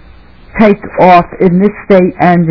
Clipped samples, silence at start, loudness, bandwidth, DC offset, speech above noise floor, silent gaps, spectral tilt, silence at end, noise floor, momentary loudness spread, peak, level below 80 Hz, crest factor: 6%; 0.55 s; -8 LUFS; 5.4 kHz; under 0.1%; 29 dB; none; -9.5 dB/octave; 0 s; -37 dBFS; 4 LU; 0 dBFS; -36 dBFS; 8 dB